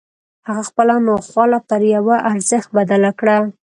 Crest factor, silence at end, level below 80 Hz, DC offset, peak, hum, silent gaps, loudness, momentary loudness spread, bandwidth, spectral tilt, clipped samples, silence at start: 14 dB; 0.2 s; -60 dBFS; under 0.1%; 0 dBFS; none; none; -15 LUFS; 7 LU; 11.5 kHz; -5.5 dB/octave; under 0.1%; 0.45 s